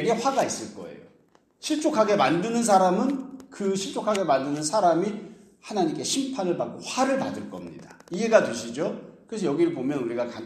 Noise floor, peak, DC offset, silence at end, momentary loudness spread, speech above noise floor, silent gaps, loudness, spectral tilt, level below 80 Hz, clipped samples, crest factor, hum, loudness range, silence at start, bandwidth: -61 dBFS; -4 dBFS; under 0.1%; 0 s; 18 LU; 36 dB; none; -25 LUFS; -4.5 dB/octave; -70 dBFS; under 0.1%; 22 dB; none; 3 LU; 0 s; 14.5 kHz